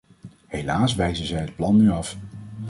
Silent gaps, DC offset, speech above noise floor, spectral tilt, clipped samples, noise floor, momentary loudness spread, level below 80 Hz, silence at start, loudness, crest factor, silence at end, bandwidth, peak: none; under 0.1%; 25 dB; -6 dB/octave; under 0.1%; -46 dBFS; 16 LU; -42 dBFS; 0.25 s; -22 LUFS; 16 dB; 0 s; 11.5 kHz; -8 dBFS